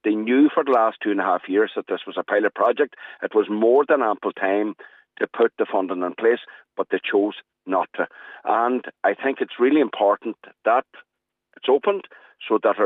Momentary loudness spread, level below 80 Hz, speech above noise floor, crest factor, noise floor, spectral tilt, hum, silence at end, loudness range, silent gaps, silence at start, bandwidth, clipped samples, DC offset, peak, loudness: 11 LU; -84 dBFS; 35 dB; 14 dB; -56 dBFS; -7.5 dB/octave; none; 0 s; 3 LU; none; 0.05 s; 4 kHz; under 0.1%; under 0.1%; -6 dBFS; -22 LUFS